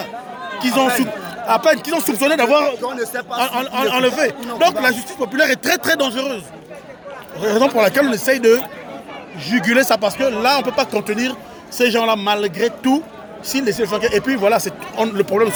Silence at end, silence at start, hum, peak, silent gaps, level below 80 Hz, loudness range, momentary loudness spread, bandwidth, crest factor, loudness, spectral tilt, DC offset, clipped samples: 0 s; 0 s; none; -2 dBFS; none; -58 dBFS; 2 LU; 15 LU; over 20 kHz; 16 dB; -17 LUFS; -3.5 dB/octave; under 0.1%; under 0.1%